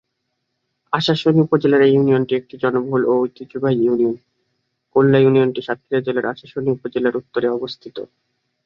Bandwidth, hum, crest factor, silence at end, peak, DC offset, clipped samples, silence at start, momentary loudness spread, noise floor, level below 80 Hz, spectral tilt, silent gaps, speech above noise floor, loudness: 7.2 kHz; none; 16 dB; 0.6 s; -2 dBFS; under 0.1%; under 0.1%; 0.9 s; 12 LU; -74 dBFS; -62 dBFS; -8 dB/octave; none; 57 dB; -18 LUFS